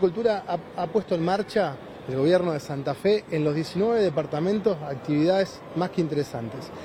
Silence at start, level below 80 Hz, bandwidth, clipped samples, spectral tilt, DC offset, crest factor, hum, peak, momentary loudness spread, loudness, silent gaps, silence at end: 0 s; -60 dBFS; 14.5 kHz; under 0.1%; -7 dB/octave; under 0.1%; 16 dB; none; -8 dBFS; 8 LU; -25 LUFS; none; 0 s